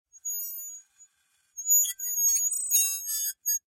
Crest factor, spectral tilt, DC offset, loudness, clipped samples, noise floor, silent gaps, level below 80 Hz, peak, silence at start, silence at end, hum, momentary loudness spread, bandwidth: 18 dB; 7.5 dB/octave; under 0.1%; -24 LUFS; under 0.1%; -70 dBFS; none; -86 dBFS; -12 dBFS; 0.15 s; 0.1 s; none; 17 LU; 16.5 kHz